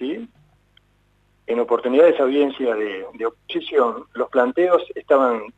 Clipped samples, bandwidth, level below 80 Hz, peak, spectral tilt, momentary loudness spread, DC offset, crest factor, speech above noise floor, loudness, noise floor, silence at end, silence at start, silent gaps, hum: under 0.1%; 8 kHz; -64 dBFS; -4 dBFS; -6 dB/octave; 13 LU; under 0.1%; 18 dB; 42 dB; -20 LUFS; -61 dBFS; 0.1 s; 0 s; none; 50 Hz at -60 dBFS